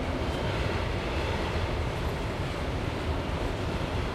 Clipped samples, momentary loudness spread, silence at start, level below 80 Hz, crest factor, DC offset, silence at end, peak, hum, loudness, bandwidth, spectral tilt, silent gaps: under 0.1%; 2 LU; 0 s; -36 dBFS; 14 dB; under 0.1%; 0 s; -16 dBFS; none; -31 LUFS; 14 kHz; -6 dB/octave; none